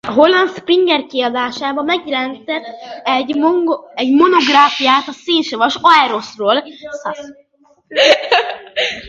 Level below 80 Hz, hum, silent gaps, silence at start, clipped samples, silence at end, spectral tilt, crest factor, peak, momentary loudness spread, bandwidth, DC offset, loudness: -60 dBFS; none; none; 0.05 s; under 0.1%; 0 s; -3 dB/octave; 14 dB; 0 dBFS; 13 LU; 7.8 kHz; under 0.1%; -14 LUFS